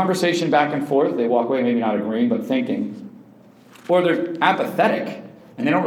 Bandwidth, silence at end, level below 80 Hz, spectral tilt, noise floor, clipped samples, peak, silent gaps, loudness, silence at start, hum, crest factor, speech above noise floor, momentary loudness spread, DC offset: 16.5 kHz; 0 s; -76 dBFS; -6 dB/octave; -48 dBFS; under 0.1%; -2 dBFS; none; -20 LUFS; 0 s; none; 18 dB; 29 dB; 12 LU; under 0.1%